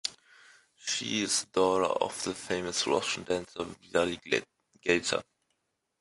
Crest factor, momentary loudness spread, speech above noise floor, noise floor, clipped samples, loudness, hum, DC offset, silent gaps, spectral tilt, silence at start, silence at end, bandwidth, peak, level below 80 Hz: 22 dB; 9 LU; 49 dB; -79 dBFS; under 0.1%; -30 LUFS; none; under 0.1%; none; -2.5 dB/octave; 0.05 s; 0.8 s; 11.5 kHz; -10 dBFS; -64 dBFS